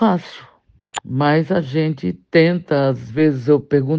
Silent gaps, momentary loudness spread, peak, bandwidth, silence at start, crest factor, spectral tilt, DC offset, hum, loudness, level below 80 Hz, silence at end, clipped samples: none; 10 LU; 0 dBFS; 9.4 kHz; 0 s; 16 dB; -7.5 dB/octave; under 0.1%; none; -18 LUFS; -56 dBFS; 0 s; under 0.1%